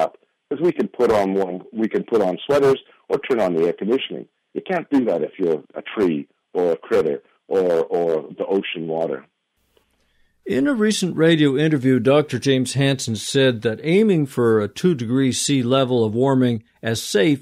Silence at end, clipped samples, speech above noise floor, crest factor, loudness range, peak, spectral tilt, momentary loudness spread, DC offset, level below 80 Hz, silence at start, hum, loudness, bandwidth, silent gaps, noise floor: 0 s; under 0.1%; 45 dB; 14 dB; 5 LU; -4 dBFS; -5.5 dB/octave; 8 LU; under 0.1%; -58 dBFS; 0 s; none; -20 LUFS; 15 kHz; none; -64 dBFS